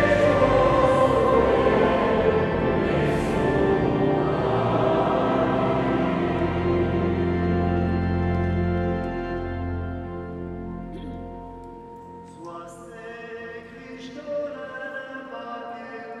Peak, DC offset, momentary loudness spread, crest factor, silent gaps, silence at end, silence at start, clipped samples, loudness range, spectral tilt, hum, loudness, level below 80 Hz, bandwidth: -6 dBFS; under 0.1%; 20 LU; 16 dB; none; 0 s; 0 s; under 0.1%; 16 LU; -8 dB/octave; none; -23 LUFS; -40 dBFS; 11.5 kHz